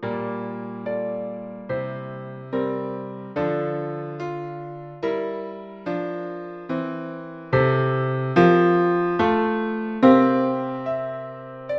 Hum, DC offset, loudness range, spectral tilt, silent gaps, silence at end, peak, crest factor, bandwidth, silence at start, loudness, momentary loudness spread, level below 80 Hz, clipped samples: none; under 0.1%; 11 LU; -9 dB/octave; none; 0 s; -2 dBFS; 22 dB; 6.2 kHz; 0 s; -23 LUFS; 17 LU; -58 dBFS; under 0.1%